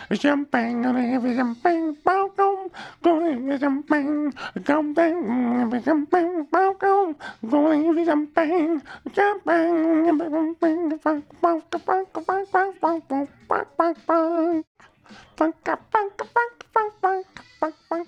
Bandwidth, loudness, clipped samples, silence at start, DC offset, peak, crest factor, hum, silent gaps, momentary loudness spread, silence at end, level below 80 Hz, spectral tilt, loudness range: 9 kHz; -23 LUFS; under 0.1%; 0 s; under 0.1%; -2 dBFS; 20 dB; none; 14.67-14.75 s; 7 LU; 0 s; -66 dBFS; -6.5 dB/octave; 3 LU